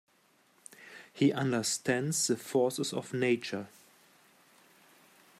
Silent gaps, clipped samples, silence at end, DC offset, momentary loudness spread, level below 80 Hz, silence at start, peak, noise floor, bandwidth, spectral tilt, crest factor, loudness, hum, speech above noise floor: none; under 0.1%; 1.7 s; under 0.1%; 20 LU; -78 dBFS; 0.8 s; -14 dBFS; -68 dBFS; 15.5 kHz; -4 dB/octave; 20 dB; -31 LUFS; none; 37 dB